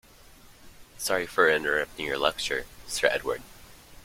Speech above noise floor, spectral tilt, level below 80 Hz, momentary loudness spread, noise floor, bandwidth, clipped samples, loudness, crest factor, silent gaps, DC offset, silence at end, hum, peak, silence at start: 25 dB; -2 dB/octave; -54 dBFS; 11 LU; -52 dBFS; 16.5 kHz; under 0.1%; -27 LUFS; 24 dB; none; under 0.1%; 0.1 s; none; -6 dBFS; 0.6 s